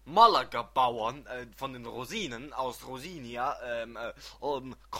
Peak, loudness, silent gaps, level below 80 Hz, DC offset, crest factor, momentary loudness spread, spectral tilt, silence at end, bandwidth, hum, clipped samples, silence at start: -6 dBFS; -31 LUFS; none; -58 dBFS; under 0.1%; 24 dB; 18 LU; -4 dB/octave; 0 s; 16.5 kHz; none; under 0.1%; 0.05 s